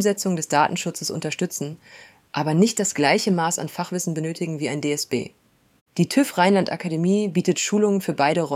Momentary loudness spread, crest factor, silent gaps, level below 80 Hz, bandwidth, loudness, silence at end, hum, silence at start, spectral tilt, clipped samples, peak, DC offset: 9 LU; 18 dB; 5.81-5.86 s; -68 dBFS; 16 kHz; -22 LUFS; 0 s; none; 0 s; -4.5 dB/octave; under 0.1%; -4 dBFS; under 0.1%